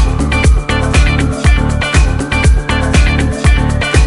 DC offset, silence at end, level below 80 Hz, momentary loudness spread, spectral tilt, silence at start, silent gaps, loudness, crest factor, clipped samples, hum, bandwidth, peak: under 0.1%; 0 s; -12 dBFS; 2 LU; -5.5 dB/octave; 0 s; none; -12 LUFS; 10 dB; under 0.1%; none; 11.5 kHz; 0 dBFS